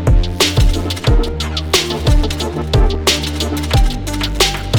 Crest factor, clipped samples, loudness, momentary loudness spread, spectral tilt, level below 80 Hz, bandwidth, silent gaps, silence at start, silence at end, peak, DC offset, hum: 12 dB; under 0.1%; -16 LUFS; 6 LU; -4 dB/octave; -16 dBFS; over 20 kHz; none; 0 s; 0 s; -2 dBFS; under 0.1%; none